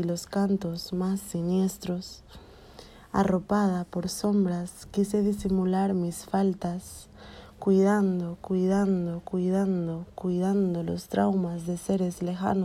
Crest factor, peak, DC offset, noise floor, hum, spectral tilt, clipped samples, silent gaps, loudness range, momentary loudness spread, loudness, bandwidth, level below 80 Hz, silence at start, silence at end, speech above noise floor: 16 dB; -12 dBFS; under 0.1%; -49 dBFS; none; -7 dB/octave; under 0.1%; none; 3 LU; 9 LU; -27 LUFS; 15 kHz; -54 dBFS; 0 s; 0 s; 22 dB